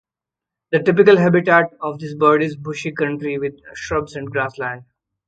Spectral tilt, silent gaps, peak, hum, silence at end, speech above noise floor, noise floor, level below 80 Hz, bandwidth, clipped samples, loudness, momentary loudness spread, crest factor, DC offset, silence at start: -7 dB/octave; none; 0 dBFS; none; 0.45 s; 69 dB; -87 dBFS; -52 dBFS; 8 kHz; under 0.1%; -18 LUFS; 15 LU; 18 dB; under 0.1%; 0.7 s